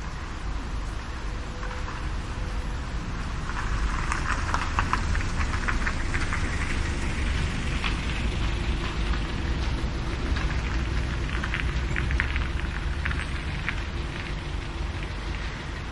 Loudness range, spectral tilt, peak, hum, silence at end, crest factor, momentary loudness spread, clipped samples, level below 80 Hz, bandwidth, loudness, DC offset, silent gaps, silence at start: 4 LU; -5 dB/octave; -6 dBFS; none; 0 s; 22 dB; 7 LU; under 0.1%; -30 dBFS; 11.5 kHz; -30 LUFS; under 0.1%; none; 0 s